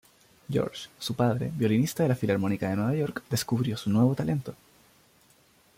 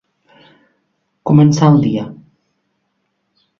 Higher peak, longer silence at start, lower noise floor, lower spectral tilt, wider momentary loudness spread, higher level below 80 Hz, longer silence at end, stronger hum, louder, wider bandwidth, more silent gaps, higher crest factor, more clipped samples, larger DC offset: second, -12 dBFS vs 0 dBFS; second, 0.5 s vs 1.25 s; second, -61 dBFS vs -68 dBFS; second, -6.5 dB/octave vs -8 dB/octave; second, 8 LU vs 17 LU; second, -60 dBFS vs -52 dBFS; second, 1.25 s vs 1.45 s; neither; second, -28 LUFS vs -12 LUFS; first, 16.5 kHz vs 7.2 kHz; neither; about the same, 16 dB vs 16 dB; neither; neither